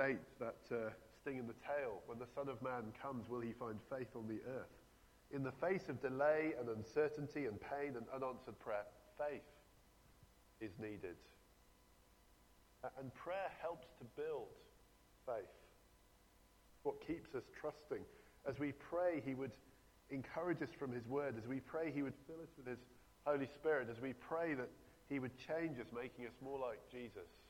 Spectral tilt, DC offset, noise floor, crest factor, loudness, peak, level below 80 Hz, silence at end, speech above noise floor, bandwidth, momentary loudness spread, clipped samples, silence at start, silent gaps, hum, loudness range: -7 dB/octave; under 0.1%; -70 dBFS; 22 dB; -46 LUFS; -24 dBFS; -74 dBFS; 0 s; 25 dB; 18 kHz; 13 LU; under 0.1%; 0 s; none; none; 9 LU